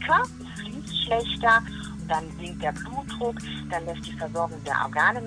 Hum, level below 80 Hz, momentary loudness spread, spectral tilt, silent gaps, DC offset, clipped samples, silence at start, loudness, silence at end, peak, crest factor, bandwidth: none; -46 dBFS; 15 LU; -4.5 dB/octave; none; under 0.1%; under 0.1%; 0 s; -27 LUFS; 0 s; -8 dBFS; 20 dB; 10.5 kHz